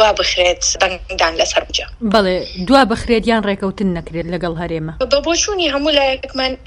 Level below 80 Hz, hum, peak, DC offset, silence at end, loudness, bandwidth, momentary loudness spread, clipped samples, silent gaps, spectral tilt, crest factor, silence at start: -34 dBFS; none; 0 dBFS; under 0.1%; 0.05 s; -16 LUFS; 11.5 kHz; 9 LU; under 0.1%; none; -3 dB/octave; 16 dB; 0 s